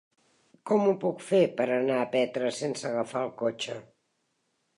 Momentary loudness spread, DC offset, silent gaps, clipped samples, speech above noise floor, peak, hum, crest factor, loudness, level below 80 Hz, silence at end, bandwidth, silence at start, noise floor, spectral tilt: 10 LU; under 0.1%; none; under 0.1%; 48 dB; -10 dBFS; none; 18 dB; -28 LUFS; -80 dBFS; 0.95 s; 11.5 kHz; 0.65 s; -76 dBFS; -5 dB/octave